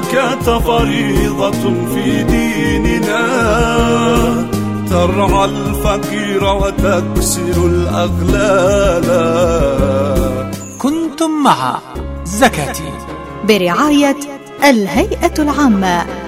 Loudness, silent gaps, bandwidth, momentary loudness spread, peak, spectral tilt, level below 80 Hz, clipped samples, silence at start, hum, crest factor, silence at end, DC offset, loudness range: -13 LUFS; none; 16.5 kHz; 8 LU; 0 dBFS; -5.5 dB/octave; -24 dBFS; under 0.1%; 0 s; none; 14 dB; 0 s; 0.9%; 2 LU